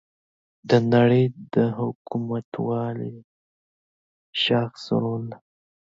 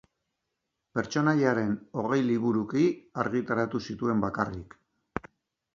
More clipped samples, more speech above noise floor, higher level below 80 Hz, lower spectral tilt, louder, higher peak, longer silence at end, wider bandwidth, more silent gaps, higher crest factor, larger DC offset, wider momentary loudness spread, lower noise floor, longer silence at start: neither; first, over 67 dB vs 55 dB; second, -64 dBFS vs -58 dBFS; about the same, -7.5 dB/octave vs -7 dB/octave; first, -23 LUFS vs -28 LUFS; first, -4 dBFS vs -8 dBFS; about the same, 0.5 s vs 0.55 s; about the same, 7.6 kHz vs 7.4 kHz; first, 1.95-2.05 s, 2.45-2.52 s, 3.24-4.33 s vs none; about the same, 20 dB vs 20 dB; neither; about the same, 14 LU vs 13 LU; first, under -90 dBFS vs -83 dBFS; second, 0.65 s vs 0.95 s